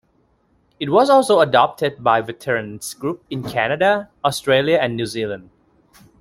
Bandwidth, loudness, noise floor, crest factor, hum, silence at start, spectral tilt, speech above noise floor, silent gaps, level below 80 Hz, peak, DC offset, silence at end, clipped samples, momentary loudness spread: 15.5 kHz; -18 LUFS; -61 dBFS; 18 dB; none; 0.8 s; -4.5 dB/octave; 43 dB; none; -58 dBFS; 0 dBFS; under 0.1%; 0.8 s; under 0.1%; 14 LU